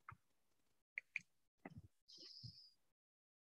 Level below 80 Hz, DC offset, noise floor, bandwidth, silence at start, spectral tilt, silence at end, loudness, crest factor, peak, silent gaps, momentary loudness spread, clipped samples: -84 dBFS; under 0.1%; -88 dBFS; 11.5 kHz; 0.1 s; -3.5 dB/octave; 0.8 s; -55 LUFS; 32 dB; -28 dBFS; 0.82-0.96 s, 1.48-1.58 s, 2.02-2.07 s; 15 LU; under 0.1%